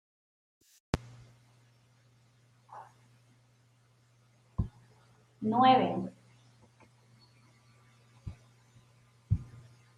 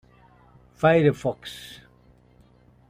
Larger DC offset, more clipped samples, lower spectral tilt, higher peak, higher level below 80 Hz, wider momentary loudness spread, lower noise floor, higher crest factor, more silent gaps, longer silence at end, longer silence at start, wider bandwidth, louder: neither; neither; about the same, -7 dB/octave vs -7 dB/octave; second, -12 dBFS vs -6 dBFS; about the same, -54 dBFS vs -58 dBFS; first, 28 LU vs 21 LU; first, -66 dBFS vs -56 dBFS; about the same, 26 dB vs 22 dB; neither; second, 0.5 s vs 1.15 s; first, 0.95 s vs 0.8 s; second, 11 kHz vs 15 kHz; second, -31 LUFS vs -22 LUFS